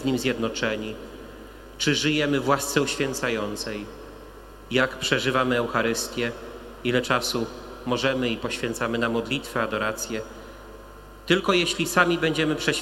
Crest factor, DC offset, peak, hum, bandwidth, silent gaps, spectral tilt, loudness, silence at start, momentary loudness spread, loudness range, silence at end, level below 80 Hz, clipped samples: 22 dB; under 0.1%; -2 dBFS; 50 Hz at -50 dBFS; 16 kHz; none; -4 dB/octave; -24 LUFS; 0 s; 21 LU; 2 LU; 0 s; -48 dBFS; under 0.1%